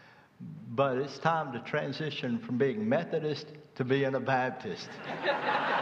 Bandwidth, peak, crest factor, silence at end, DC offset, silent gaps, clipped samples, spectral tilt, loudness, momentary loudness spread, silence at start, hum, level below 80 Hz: 7.8 kHz; -12 dBFS; 20 dB; 0 s; under 0.1%; none; under 0.1%; -6.5 dB/octave; -32 LUFS; 11 LU; 0 s; none; -76 dBFS